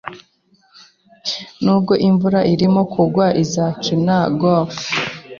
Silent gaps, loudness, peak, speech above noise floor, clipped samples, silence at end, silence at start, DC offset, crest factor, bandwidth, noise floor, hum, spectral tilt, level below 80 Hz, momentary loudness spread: none; -17 LUFS; -2 dBFS; 42 dB; under 0.1%; 0 s; 0.05 s; under 0.1%; 14 dB; 7.2 kHz; -57 dBFS; none; -6 dB/octave; -54 dBFS; 9 LU